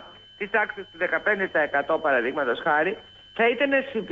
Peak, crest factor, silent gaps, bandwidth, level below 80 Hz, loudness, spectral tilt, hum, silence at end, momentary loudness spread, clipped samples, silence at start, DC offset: -10 dBFS; 14 dB; none; 7.6 kHz; -64 dBFS; -24 LUFS; -6 dB/octave; none; 0 s; 7 LU; under 0.1%; 0 s; under 0.1%